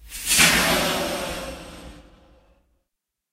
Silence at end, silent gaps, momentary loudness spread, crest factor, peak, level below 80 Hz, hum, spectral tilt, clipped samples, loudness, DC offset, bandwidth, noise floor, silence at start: 1.3 s; none; 22 LU; 24 dB; 0 dBFS; -44 dBFS; none; -1.5 dB/octave; under 0.1%; -19 LUFS; under 0.1%; 16 kHz; -82 dBFS; 0 s